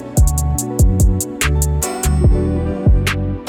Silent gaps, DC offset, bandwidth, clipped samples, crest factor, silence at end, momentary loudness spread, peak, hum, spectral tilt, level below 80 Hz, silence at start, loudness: none; under 0.1%; 18 kHz; under 0.1%; 12 dB; 0 s; 4 LU; -2 dBFS; none; -5.5 dB/octave; -18 dBFS; 0 s; -16 LUFS